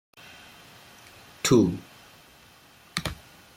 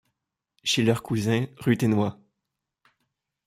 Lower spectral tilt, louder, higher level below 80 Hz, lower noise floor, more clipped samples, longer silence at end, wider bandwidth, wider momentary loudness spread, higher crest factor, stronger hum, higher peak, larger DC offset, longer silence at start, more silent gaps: about the same, -5 dB/octave vs -5.5 dB/octave; about the same, -26 LUFS vs -25 LUFS; first, -54 dBFS vs -60 dBFS; second, -54 dBFS vs -84 dBFS; neither; second, 0.4 s vs 1.35 s; about the same, 16.5 kHz vs 16 kHz; first, 27 LU vs 5 LU; about the same, 22 dB vs 18 dB; neither; about the same, -8 dBFS vs -8 dBFS; neither; first, 1.45 s vs 0.65 s; neither